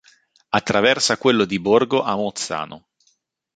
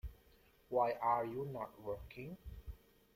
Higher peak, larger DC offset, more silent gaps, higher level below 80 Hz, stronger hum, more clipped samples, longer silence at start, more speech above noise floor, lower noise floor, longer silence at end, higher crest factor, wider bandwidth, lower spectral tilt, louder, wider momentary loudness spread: first, -2 dBFS vs -22 dBFS; neither; neither; about the same, -56 dBFS vs -58 dBFS; neither; neither; first, 0.5 s vs 0.05 s; first, 47 dB vs 29 dB; about the same, -66 dBFS vs -68 dBFS; first, 0.8 s vs 0.4 s; about the same, 20 dB vs 20 dB; second, 9.4 kHz vs 16.5 kHz; second, -3.5 dB/octave vs -8 dB/octave; first, -19 LUFS vs -40 LUFS; second, 9 LU vs 20 LU